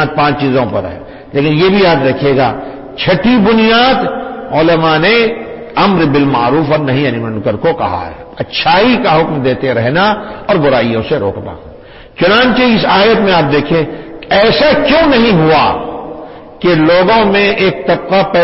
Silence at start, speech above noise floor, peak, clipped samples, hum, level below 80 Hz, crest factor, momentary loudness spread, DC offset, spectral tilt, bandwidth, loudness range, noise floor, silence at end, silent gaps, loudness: 0 s; 23 dB; 0 dBFS; under 0.1%; none; -36 dBFS; 10 dB; 13 LU; under 0.1%; -9 dB/octave; 5.8 kHz; 3 LU; -33 dBFS; 0 s; none; -10 LUFS